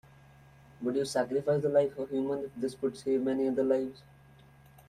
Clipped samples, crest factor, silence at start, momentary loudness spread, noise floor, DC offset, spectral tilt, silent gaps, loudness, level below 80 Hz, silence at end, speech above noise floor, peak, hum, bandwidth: under 0.1%; 18 dB; 0.8 s; 7 LU; -57 dBFS; under 0.1%; -6.5 dB/octave; none; -31 LUFS; -66 dBFS; 0.9 s; 27 dB; -14 dBFS; none; 13.5 kHz